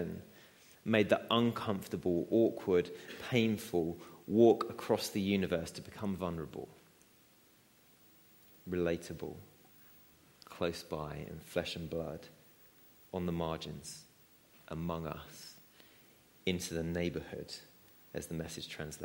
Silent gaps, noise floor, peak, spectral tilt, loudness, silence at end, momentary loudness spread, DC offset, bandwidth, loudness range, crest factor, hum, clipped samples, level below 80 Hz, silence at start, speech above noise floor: none; -66 dBFS; -12 dBFS; -5.5 dB/octave; -36 LUFS; 0 s; 18 LU; under 0.1%; 16.5 kHz; 11 LU; 26 dB; none; under 0.1%; -62 dBFS; 0 s; 31 dB